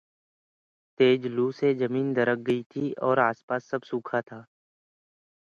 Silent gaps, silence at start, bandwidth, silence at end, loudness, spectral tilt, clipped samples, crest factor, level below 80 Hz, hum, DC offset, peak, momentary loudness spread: 2.66-2.70 s, 3.43-3.48 s; 1 s; 7 kHz; 1 s; -26 LUFS; -7.5 dB/octave; under 0.1%; 20 dB; -74 dBFS; none; under 0.1%; -8 dBFS; 10 LU